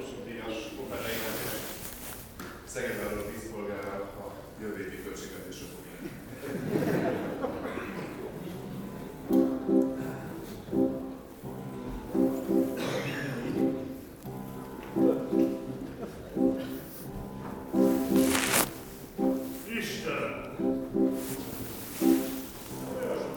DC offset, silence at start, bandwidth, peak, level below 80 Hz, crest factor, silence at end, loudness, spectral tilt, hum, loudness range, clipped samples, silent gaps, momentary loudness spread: under 0.1%; 0 s; over 20 kHz; -6 dBFS; -54 dBFS; 24 dB; 0 s; -32 LUFS; -5 dB/octave; none; 8 LU; under 0.1%; none; 15 LU